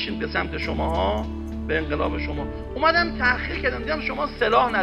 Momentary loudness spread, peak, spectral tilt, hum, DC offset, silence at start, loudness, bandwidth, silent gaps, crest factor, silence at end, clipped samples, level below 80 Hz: 9 LU; -6 dBFS; -6.5 dB/octave; none; under 0.1%; 0 s; -24 LUFS; 8.6 kHz; none; 18 dB; 0 s; under 0.1%; -34 dBFS